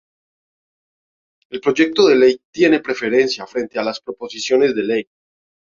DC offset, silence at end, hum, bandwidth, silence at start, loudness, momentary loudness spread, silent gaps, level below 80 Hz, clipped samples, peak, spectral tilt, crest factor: under 0.1%; 0.75 s; none; 7.4 kHz; 1.5 s; -17 LUFS; 12 LU; 2.45-2.53 s; -62 dBFS; under 0.1%; -2 dBFS; -4 dB/octave; 16 dB